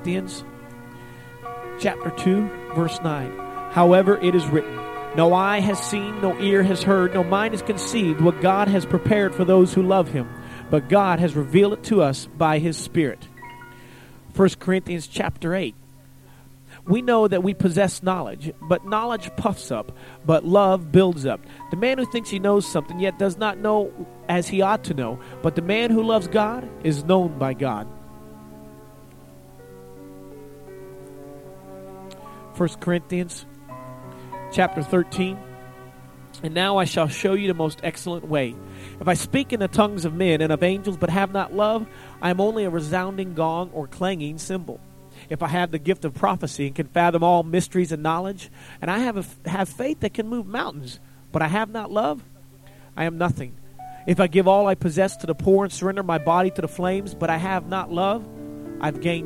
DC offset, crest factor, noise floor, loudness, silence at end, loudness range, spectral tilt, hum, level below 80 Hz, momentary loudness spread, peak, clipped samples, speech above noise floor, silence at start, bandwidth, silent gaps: under 0.1%; 20 dB; -47 dBFS; -22 LUFS; 0 s; 8 LU; -6 dB/octave; none; -50 dBFS; 21 LU; -2 dBFS; under 0.1%; 26 dB; 0 s; 16 kHz; none